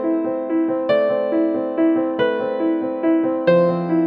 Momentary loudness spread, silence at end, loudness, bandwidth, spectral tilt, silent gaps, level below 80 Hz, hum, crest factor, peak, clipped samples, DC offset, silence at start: 4 LU; 0 s; -19 LUFS; 5 kHz; -9.5 dB/octave; none; -70 dBFS; none; 14 dB; -4 dBFS; under 0.1%; under 0.1%; 0 s